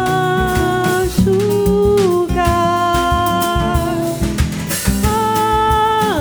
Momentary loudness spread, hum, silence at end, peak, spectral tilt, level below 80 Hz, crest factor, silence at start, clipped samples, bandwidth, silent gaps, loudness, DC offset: 5 LU; none; 0 s; 0 dBFS; -5.5 dB/octave; -26 dBFS; 14 dB; 0 s; under 0.1%; over 20 kHz; none; -15 LUFS; under 0.1%